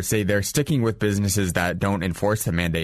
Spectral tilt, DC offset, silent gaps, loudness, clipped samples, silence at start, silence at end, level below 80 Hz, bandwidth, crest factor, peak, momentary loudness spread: -5 dB/octave; under 0.1%; none; -23 LUFS; under 0.1%; 0 s; 0 s; -42 dBFS; 14 kHz; 16 dB; -6 dBFS; 2 LU